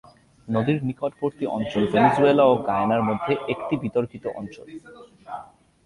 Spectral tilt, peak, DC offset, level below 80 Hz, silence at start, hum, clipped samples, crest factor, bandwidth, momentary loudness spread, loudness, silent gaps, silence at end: -8 dB/octave; -4 dBFS; under 0.1%; -56 dBFS; 0.45 s; none; under 0.1%; 20 dB; 11.5 kHz; 21 LU; -22 LUFS; none; 0.4 s